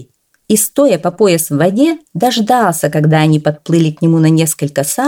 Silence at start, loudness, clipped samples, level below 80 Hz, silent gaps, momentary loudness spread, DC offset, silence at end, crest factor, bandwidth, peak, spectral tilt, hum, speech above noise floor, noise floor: 0 s; -12 LUFS; under 0.1%; -56 dBFS; none; 4 LU; under 0.1%; 0 s; 12 dB; 18.5 kHz; 0 dBFS; -5.5 dB/octave; none; 29 dB; -41 dBFS